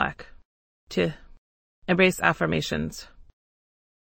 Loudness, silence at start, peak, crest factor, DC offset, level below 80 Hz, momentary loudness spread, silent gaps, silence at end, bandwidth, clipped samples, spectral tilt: -25 LUFS; 0 s; -4 dBFS; 24 dB; under 0.1%; -50 dBFS; 18 LU; 0.45-0.87 s, 1.38-1.82 s; 1 s; 16.5 kHz; under 0.1%; -5 dB/octave